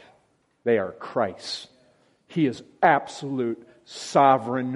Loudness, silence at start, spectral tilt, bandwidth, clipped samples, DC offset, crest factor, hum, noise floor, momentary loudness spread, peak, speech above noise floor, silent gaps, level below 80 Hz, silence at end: -24 LUFS; 0.65 s; -5.5 dB/octave; 11.5 kHz; under 0.1%; under 0.1%; 22 dB; none; -65 dBFS; 15 LU; -4 dBFS; 41 dB; none; -72 dBFS; 0 s